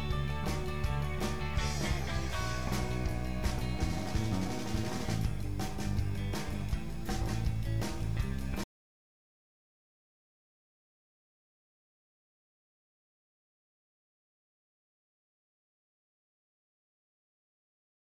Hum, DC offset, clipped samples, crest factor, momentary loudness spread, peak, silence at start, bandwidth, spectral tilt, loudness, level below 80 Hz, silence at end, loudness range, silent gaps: none; 1%; under 0.1%; 18 dB; 3 LU; -20 dBFS; 0 s; 19 kHz; -5.5 dB/octave; -35 LUFS; -42 dBFS; 9.5 s; 6 LU; none